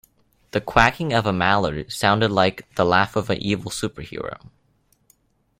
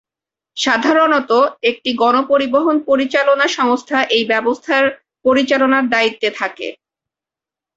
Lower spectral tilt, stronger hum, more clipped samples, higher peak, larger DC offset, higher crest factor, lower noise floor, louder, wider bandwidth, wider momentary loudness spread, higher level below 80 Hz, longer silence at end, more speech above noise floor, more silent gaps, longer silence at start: first, -5 dB/octave vs -3 dB/octave; neither; neither; about the same, 0 dBFS vs -2 dBFS; neither; first, 22 dB vs 14 dB; second, -64 dBFS vs -88 dBFS; second, -21 LUFS vs -15 LUFS; first, 16.5 kHz vs 8 kHz; first, 14 LU vs 7 LU; first, -44 dBFS vs -60 dBFS; first, 1.25 s vs 1.05 s; second, 43 dB vs 73 dB; neither; about the same, 0.55 s vs 0.55 s